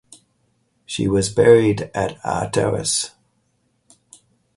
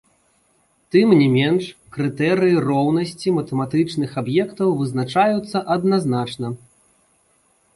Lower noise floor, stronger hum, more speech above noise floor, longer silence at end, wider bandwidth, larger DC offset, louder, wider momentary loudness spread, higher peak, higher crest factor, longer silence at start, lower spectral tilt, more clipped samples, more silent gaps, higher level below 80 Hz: first, -66 dBFS vs -62 dBFS; neither; first, 49 dB vs 44 dB; first, 1.5 s vs 1.2 s; about the same, 11.5 kHz vs 11.5 kHz; neither; about the same, -19 LUFS vs -19 LUFS; about the same, 12 LU vs 11 LU; about the same, 0 dBFS vs -2 dBFS; about the same, 20 dB vs 16 dB; about the same, 0.9 s vs 0.95 s; second, -4.5 dB/octave vs -7 dB/octave; neither; neither; first, -46 dBFS vs -58 dBFS